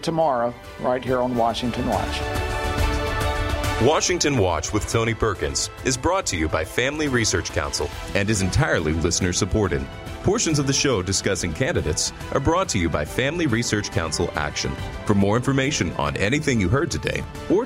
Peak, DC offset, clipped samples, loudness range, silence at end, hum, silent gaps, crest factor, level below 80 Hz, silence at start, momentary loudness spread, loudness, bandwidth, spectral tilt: -4 dBFS; under 0.1%; under 0.1%; 1 LU; 0 s; none; none; 18 dB; -34 dBFS; 0 s; 6 LU; -22 LUFS; 16 kHz; -4 dB/octave